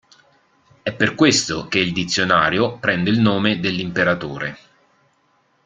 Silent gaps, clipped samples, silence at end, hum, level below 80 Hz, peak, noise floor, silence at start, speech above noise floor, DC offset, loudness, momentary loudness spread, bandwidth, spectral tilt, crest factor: none; under 0.1%; 1.1 s; none; -52 dBFS; -2 dBFS; -62 dBFS; 0.85 s; 43 dB; under 0.1%; -18 LUFS; 12 LU; 9.6 kHz; -4 dB/octave; 18 dB